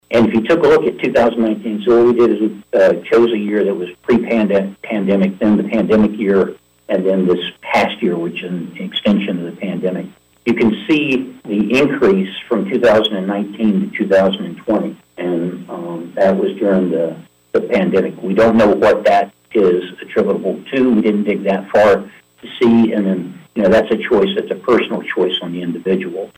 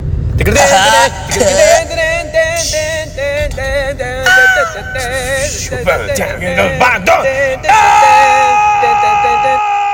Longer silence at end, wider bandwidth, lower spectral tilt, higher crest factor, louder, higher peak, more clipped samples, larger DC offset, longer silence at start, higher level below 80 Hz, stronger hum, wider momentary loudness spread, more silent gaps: about the same, 0.1 s vs 0 s; second, 16 kHz vs 18 kHz; first, -7 dB/octave vs -3 dB/octave; about the same, 10 dB vs 10 dB; second, -15 LUFS vs -10 LUFS; second, -6 dBFS vs 0 dBFS; second, under 0.1% vs 0.2%; neither; about the same, 0.1 s vs 0 s; second, -50 dBFS vs -26 dBFS; neither; about the same, 10 LU vs 10 LU; neither